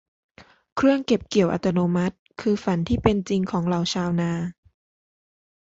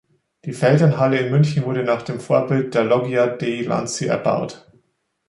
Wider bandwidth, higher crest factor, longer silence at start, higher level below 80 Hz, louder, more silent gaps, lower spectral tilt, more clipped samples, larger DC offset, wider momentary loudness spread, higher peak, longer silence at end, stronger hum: second, 8 kHz vs 11.5 kHz; about the same, 20 dB vs 16 dB; about the same, 0.4 s vs 0.45 s; first, -46 dBFS vs -60 dBFS; second, -23 LUFS vs -19 LUFS; first, 0.72-0.76 s, 2.19-2.26 s vs none; about the same, -6.5 dB/octave vs -6.5 dB/octave; neither; neither; about the same, 8 LU vs 8 LU; about the same, -4 dBFS vs -4 dBFS; first, 1.15 s vs 0.7 s; neither